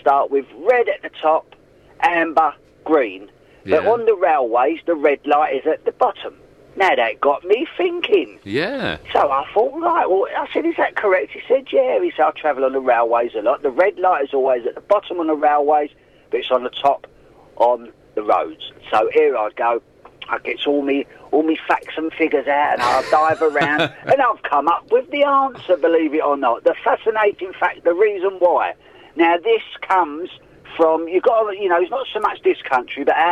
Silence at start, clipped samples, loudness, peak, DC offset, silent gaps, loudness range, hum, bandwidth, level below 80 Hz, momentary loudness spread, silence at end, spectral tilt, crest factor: 0.05 s; under 0.1%; -18 LUFS; -4 dBFS; under 0.1%; none; 3 LU; none; 11.5 kHz; -58 dBFS; 6 LU; 0 s; -5.5 dB/octave; 14 dB